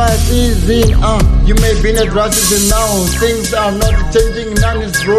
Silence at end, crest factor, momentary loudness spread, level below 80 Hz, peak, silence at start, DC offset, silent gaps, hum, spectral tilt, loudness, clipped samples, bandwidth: 0 s; 10 dB; 4 LU; -14 dBFS; 0 dBFS; 0 s; under 0.1%; none; none; -4.5 dB/octave; -12 LUFS; under 0.1%; 13.5 kHz